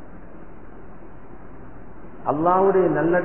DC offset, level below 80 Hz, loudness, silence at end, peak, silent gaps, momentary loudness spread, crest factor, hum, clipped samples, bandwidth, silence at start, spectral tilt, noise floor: 2%; -48 dBFS; -20 LUFS; 0 s; -6 dBFS; none; 27 LU; 18 dB; none; under 0.1%; 3.2 kHz; 0 s; -12 dB/octave; -43 dBFS